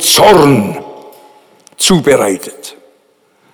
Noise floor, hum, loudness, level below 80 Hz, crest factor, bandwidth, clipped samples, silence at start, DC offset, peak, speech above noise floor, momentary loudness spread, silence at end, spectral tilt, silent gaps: -53 dBFS; none; -9 LUFS; -42 dBFS; 12 dB; over 20 kHz; 0.3%; 0 s; under 0.1%; 0 dBFS; 44 dB; 25 LU; 0.85 s; -3.5 dB/octave; none